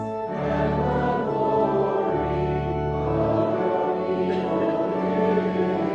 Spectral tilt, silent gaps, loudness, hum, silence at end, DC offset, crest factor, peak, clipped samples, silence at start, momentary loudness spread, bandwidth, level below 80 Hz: -9 dB/octave; none; -24 LUFS; none; 0 s; under 0.1%; 12 dB; -10 dBFS; under 0.1%; 0 s; 3 LU; 7.6 kHz; -42 dBFS